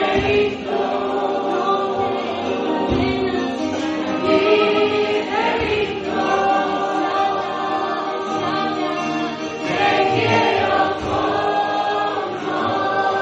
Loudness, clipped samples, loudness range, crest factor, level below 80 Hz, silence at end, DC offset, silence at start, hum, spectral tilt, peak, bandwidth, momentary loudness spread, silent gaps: -19 LUFS; under 0.1%; 2 LU; 16 dB; -46 dBFS; 0 s; under 0.1%; 0 s; none; -5 dB/octave; -2 dBFS; 8.2 kHz; 6 LU; none